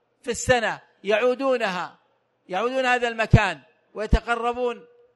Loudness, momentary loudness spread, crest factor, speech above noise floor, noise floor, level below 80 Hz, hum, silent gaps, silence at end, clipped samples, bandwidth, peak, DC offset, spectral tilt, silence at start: -23 LUFS; 14 LU; 24 dB; 41 dB; -63 dBFS; -34 dBFS; none; none; 0.35 s; under 0.1%; 11.5 kHz; 0 dBFS; under 0.1%; -5 dB/octave; 0.25 s